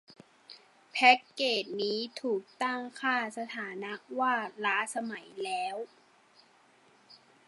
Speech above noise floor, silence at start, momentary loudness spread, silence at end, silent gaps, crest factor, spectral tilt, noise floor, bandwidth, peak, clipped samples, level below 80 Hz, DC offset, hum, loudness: 32 dB; 0.1 s; 15 LU; 0.3 s; none; 26 dB; -2.5 dB/octave; -63 dBFS; 11.5 kHz; -8 dBFS; under 0.1%; -90 dBFS; under 0.1%; none; -31 LUFS